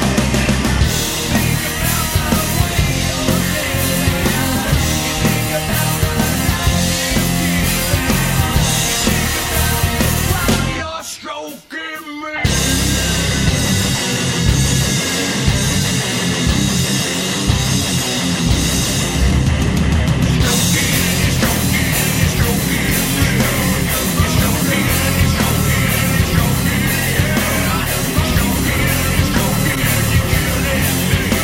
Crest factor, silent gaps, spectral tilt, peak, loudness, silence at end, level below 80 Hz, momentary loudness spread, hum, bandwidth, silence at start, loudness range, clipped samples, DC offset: 16 dB; none; -4 dB/octave; 0 dBFS; -15 LUFS; 0 s; -24 dBFS; 2 LU; none; 16.5 kHz; 0 s; 2 LU; under 0.1%; under 0.1%